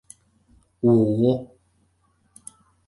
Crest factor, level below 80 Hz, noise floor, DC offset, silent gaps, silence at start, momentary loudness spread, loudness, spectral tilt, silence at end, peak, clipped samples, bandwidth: 18 dB; -58 dBFS; -65 dBFS; under 0.1%; none; 0.85 s; 26 LU; -21 LUFS; -9 dB/octave; 1.4 s; -6 dBFS; under 0.1%; 11.5 kHz